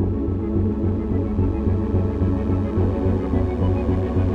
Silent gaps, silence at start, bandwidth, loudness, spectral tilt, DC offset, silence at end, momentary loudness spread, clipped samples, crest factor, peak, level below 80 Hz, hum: none; 0 s; 4.4 kHz; -22 LUFS; -11 dB/octave; under 0.1%; 0 s; 2 LU; under 0.1%; 12 dB; -8 dBFS; -28 dBFS; none